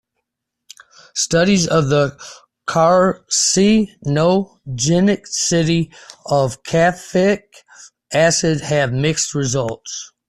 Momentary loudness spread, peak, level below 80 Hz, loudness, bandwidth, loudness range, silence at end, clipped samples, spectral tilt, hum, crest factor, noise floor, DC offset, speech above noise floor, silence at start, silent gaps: 12 LU; -2 dBFS; -48 dBFS; -16 LUFS; 13 kHz; 3 LU; 0.2 s; under 0.1%; -4.5 dB/octave; none; 14 dB; -78 dBFS; under 0.1%; 61 dB; 1.15 s; none